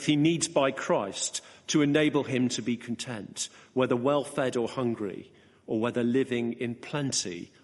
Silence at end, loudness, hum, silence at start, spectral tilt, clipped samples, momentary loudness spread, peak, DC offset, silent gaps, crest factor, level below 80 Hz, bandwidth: 0.15 s; -29 LUFS; none; 0 s; -4.5 dB/octave; under 0.1%; 11 LU; -10 dBFS; under 0.1%; none; 18 dB; -70 dBFS; 11.5 kHz